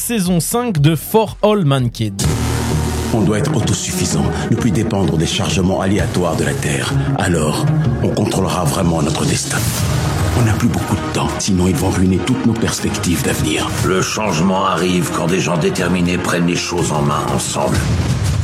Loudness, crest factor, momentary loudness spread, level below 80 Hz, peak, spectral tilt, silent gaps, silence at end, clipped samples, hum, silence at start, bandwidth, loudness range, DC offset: -16 LUFS; 14 dB; 3 LU; -32 dBFS; -2 dBFS; -5 dB/octave; none; 0 s; under 0.1%; none; 0 s; 16 kHz; 1 LU; under 0.1%